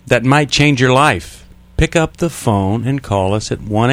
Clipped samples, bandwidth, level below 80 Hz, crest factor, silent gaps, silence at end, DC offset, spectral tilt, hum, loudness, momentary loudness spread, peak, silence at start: under 0.1%; 16 kHz; -32 dBFS; 14 dB; none; 0 s; under 0.1%; -5.5 dB/octave; none; -14 LUFS; 9 LU; 0 dBFS; 0.05 s